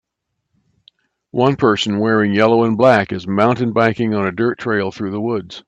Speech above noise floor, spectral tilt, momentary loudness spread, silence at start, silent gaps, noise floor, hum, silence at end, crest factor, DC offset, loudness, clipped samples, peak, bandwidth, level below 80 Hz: 60 dB; -6.5 dB/octave; 9 LU; 1.35 s; none; -75 dBFS; none; 0.05 s; 16 dB; under 0.1%; -16 LUFS; under 0.1%; 0 dBFS; 8.6 kHz; -56 dBFS